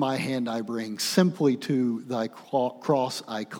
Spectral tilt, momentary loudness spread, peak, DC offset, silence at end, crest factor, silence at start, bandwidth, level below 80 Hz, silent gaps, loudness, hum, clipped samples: -5.5 dB/octave; 8 LU; -6 dBFS; under 0.1%; 0 s; 20 dB; 0 s; over 20 kHz; -80 dBFS; none; -27 LUFS; none; under 0.1%